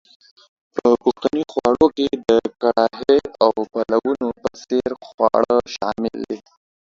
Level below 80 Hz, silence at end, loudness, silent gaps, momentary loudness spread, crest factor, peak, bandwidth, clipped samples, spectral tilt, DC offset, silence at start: -54 dBFS; 0.5 s; -19 LUFS; 5.14-5.18 s; 9 LU; 18 dB; 0 dBFS; 7.6 kHz; under 0.1%; -5.5 dB/octave; under 0.1%; 0.75 s